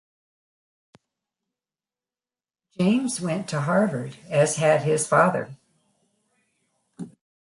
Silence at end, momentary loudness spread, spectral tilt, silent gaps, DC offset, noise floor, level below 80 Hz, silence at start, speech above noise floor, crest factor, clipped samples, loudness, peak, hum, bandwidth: 0.4 s; 21 LU; -5.5 dB/octave; none; under 0.1%; under -90 dBFS; -68 dBFS; 2.8 s; over 68 dB; 22 dB; under 0.1%; -23 LUFS; -6 dBFS; none; 11.5 kHz